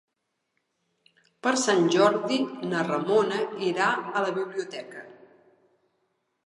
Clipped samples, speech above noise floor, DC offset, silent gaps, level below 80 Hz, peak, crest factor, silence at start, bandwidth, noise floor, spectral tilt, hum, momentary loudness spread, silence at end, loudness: under 0.1%; 54 dB; under 0.1%; none; -82 dBFS; -8 dBFS; 20 dB; 1.45 s; 11.5 kHz; -79 dBFS; -4 dB/octave; none; 13 LU; 1.35 s; -25 LUFS